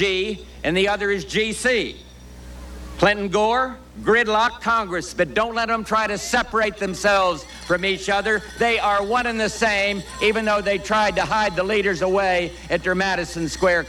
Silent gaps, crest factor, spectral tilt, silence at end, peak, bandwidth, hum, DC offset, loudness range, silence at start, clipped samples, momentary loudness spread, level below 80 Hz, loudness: none; 18 dB; -3.5 dB/octave; 0 s; -4 dBFS; 17 kHz; none; under 0.1%; 1 LU; 0 s; under 0.1%; 7 LU; -42 dBFS; -21 LUFS